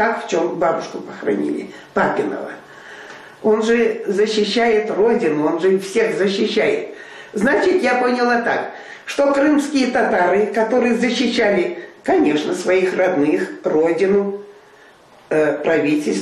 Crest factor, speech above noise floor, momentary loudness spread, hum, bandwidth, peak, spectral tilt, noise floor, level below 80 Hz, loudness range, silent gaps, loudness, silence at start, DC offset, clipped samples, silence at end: 14 dB; 30 dB; 12 LU; none; 12.5 kHz; -4 dBFS; -5 dB/octave; -47 dBFS; -58 dBFS; 3 LU; none; -18 LUFS; 0 s; under 0.1%; under 0.1%; 0 s